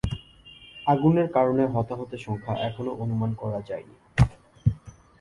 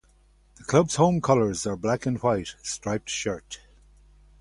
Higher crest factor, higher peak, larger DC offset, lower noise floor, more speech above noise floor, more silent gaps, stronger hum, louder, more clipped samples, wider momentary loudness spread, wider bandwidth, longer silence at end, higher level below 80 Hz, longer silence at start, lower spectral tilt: about the same, 20 dB vs 20 dB; about the same, -6 dBFS vs -6 dBFS; neither; second, -50 dBFS vs -59 dBFS; second, 25 dB vs 35 dB; neither; second, none vs 50 Hz at -50 dBFS; about the same, -26 LUFS vs -25 LUFS; neither; about the same, 16 LU vs 14 LU; about the same, 11.5 kHz vs 11.5 kHz; second, 0.3 s vs 0.85 s; first, -42 dBFS vs -52 dBFS; second, 0.05 s vs 0.6 s; first, -8.5 dB/octave vs -5 dB/octave